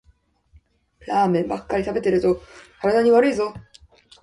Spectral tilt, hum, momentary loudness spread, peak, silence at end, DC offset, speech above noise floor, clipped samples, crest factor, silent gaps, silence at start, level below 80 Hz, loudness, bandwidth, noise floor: -7 dB/octave; none; 10 LU; -4 dBFS; 0.6 s; under 0.1%; 40 dB; under 0.1%; 18 dB; none; 1.05 s; -50 dBFS; -21 LUFS; 11.5 kHz; -60 dBFS